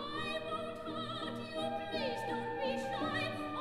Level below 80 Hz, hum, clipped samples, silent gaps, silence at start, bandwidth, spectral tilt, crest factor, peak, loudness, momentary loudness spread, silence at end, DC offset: -64 dBFS; none; under 0.1%; none; 0 s; 17 kHz; -5 dB/octave; 14 dB; -24 dBFS; -38 LUFS; 4 LU; 0 s; 0.1%